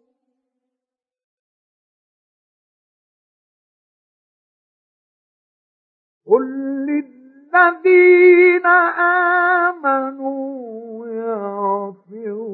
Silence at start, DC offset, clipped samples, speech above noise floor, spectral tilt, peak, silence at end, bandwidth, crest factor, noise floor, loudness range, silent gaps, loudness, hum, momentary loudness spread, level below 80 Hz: 6.3 s; under 0.1%; under 0.1%; 73 dB; -9.5 dB/octave; 0 dBFS; 0 s; 4.3 kHz; 18 dB; -87 dBFS; 12 LU; none; -15 LUFS; none; 20 LU; -90 dBFS